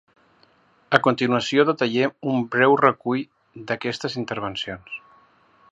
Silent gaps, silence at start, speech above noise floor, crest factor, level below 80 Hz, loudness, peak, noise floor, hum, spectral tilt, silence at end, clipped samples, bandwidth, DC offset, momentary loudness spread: none; 0.9 s; 37 dB; 22 dB; -62 dBFS; -22 LUFS; 0 dBFS; -59 dBFS; none; -5.5 dB/octave; 0.75 s; under 0.1%; 8 kHz; under 0.1%; 15 LU